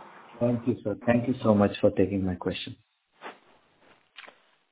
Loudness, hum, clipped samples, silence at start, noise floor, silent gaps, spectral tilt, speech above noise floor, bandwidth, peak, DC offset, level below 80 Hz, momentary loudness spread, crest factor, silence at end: -27 LUFS; none; under 0.1%; 0 s; -62 dBFS; none; -11 dB/octave; 36 dB; 4 kHz; -6 dBFS; under 0.1%; -52 dBFS; 24 LU; 22 dB; 0.45 s